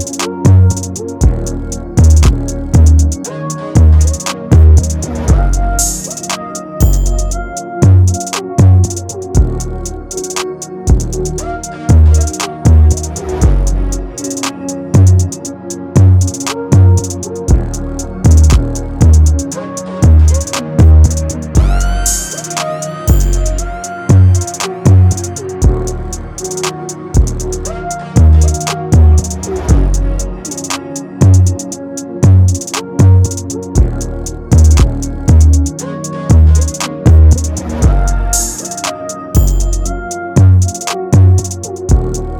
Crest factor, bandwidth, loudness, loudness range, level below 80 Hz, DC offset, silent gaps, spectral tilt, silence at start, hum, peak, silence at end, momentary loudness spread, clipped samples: 10 dB; 17.5 kHz; -12 LUFS; 3 LU; -14 dBFS; under 0.1%; none; -6 dB/octave; 0 s; none; 0 dBFS; 0 s; 13 LU; 0.5%